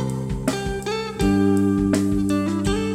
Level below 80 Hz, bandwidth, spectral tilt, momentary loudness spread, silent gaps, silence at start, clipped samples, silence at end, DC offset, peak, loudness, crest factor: -36 dBFS; 15.5 kHz; -6.5 dB/octave; 8 LU; none; 0 s; under 0.1%; 0 s; under 0.1%; -6 dBFS; -21 LUFS; 14 dB